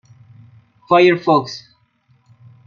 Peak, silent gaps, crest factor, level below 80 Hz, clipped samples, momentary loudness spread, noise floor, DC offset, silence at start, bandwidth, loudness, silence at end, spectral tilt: -2 dBFS; none; 18 dB; -66 dBFS; under 0.1%; 19 LU; -58 dBFS; under 0.1%; 0.9 s; 7 kHz; -14 LUFS; 1.1 s; -6 dB/octave